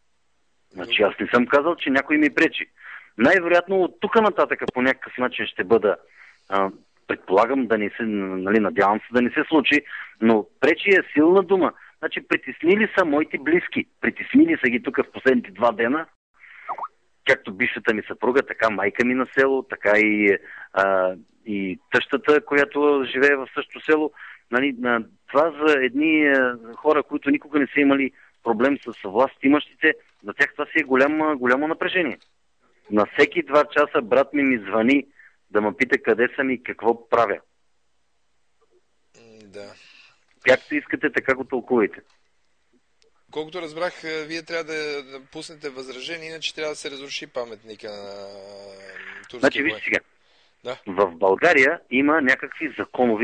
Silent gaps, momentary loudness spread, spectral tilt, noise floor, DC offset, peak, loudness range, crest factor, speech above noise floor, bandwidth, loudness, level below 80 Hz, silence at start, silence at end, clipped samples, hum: 16.16-16.34 s; 15 LU; -5.5 dB/octave; -73 dBFS; under 0.1%; -4 dBFS; 10 LU; 18 dB; 52 dB; 9.4 kHz; -21 LUFS; -62 dBFS; 0.75 s; 0 s; under 0.1%; none